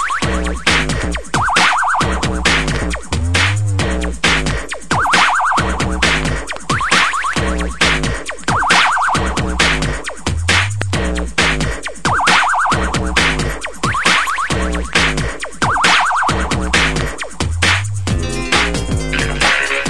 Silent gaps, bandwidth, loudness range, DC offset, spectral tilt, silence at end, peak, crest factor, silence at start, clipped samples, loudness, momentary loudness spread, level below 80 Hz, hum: none; 12 kHz; 1 LU; 3%; -3.5 dB/octave; 0 s; 0 dBFS; 16 dB; 0 s; under 0.1%; -15 LUFS; 9 LU; -26 dBFS; none